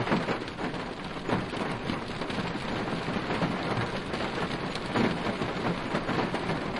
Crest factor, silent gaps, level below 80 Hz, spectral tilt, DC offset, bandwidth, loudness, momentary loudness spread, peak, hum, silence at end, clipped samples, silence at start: 16 dB; none; -50 dBFS; -6 dB/octave; under 0.1%; 11.5 kHz; -31 LUFS; 5 LU; -14 dBFS; none; 0 s; under 0.1%; 0 s